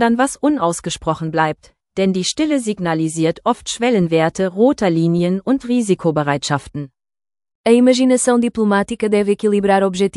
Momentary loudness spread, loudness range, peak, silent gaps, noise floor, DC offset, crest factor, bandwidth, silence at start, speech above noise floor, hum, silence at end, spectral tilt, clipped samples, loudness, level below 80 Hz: 8 LU; 3 LU; 0 dBFS; 7.55-7.64 s; under -90 dBFS; under 0.1%; 16 dB; 12 kHz; 0 s; over 74 dB; none; 0 s; -5.5 dB/octave; under 0.1%; -17 LUFS; -50 dBFS